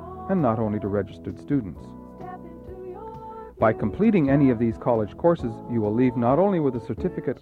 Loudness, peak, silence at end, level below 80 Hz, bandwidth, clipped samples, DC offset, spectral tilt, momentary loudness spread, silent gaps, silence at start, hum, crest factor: -23 LUFS; -6 dBFS; 0.05 s; -48 dBFS; 4.9 kHz; under 0.1%; under 0.1%; -10.5 dB/octave; 19 LU; none; 0 s; none; 18 dB